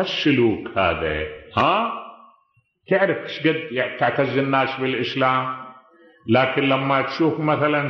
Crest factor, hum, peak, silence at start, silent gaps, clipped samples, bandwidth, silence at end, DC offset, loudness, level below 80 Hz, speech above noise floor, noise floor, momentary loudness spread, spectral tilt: 16 dB; none; -4 dBFS; 0 s; none; under 0.1%; 6.6 kHz; 0 s; under 0.1%; -21 LUFS; -50 dBFS; 43 dB; -64 dBFS; 8 LU; -7 dB/octave